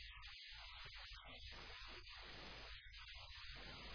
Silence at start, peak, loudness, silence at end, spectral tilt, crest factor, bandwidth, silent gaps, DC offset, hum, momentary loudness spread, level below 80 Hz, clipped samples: 0 s; -42 dBFS; -55 LUFS; 0 s; -1 dB/octave; 14 dB; 5.4 kHz; none; under 0.1%; none; 1 LU; -62 dBFS; under 0.1%